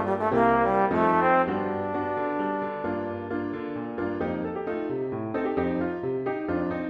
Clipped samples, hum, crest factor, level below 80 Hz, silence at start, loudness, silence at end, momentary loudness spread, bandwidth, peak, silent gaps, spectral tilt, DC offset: under 0.1%; none; 18 dB; -54 dBFS; 0 s; -27 LUFS; 0 s; 10 LU; 6.8 kHz; -8 dBFS; none; -9 dB/octave; under 0.1%